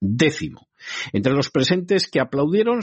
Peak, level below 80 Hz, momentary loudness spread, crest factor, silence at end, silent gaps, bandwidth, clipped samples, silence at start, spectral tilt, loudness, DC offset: -4 dBFS; -54 dBFS; 12 LU; 16 dB; 0 s; none; 8.4 kHz; under 0.1%; 0 s; -5.5 dB/octave; -20 LUFS; under 0.1%